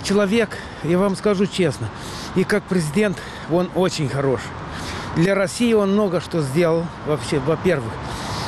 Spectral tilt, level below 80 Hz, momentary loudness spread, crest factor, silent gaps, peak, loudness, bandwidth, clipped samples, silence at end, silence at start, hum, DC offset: -6 dB/octave; -44 dBFS; 10 LU; 12 dB; none; -8 dBFS; -21 LUFS; 13.5 kHz; under 0.1%; 0 s; 0 s; none; under 0.1%